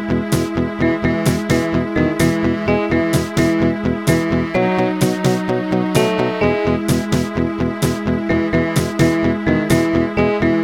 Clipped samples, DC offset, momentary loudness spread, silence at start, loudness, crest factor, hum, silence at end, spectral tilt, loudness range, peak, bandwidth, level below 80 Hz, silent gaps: under 0.1%; 0.2%; 3 LU; 0 s; -17 LUFS; 16 dB; none; 0 s; -6 dB/octave; 1 LU; 0 dBFS; 17 kHz; -36 dBFS; none